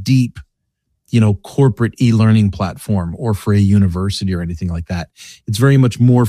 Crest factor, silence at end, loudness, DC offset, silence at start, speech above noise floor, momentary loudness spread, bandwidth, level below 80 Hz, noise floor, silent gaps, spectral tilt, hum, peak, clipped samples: 14 dB; 0 s; -15 LUFS; under 0.1%; 0 s; 56 dB; 11 LU; 14 kHz; -38 dBFS; -70 dBFS; none; -7.5 dB/octave; none; -2 dBFS; under 0.1%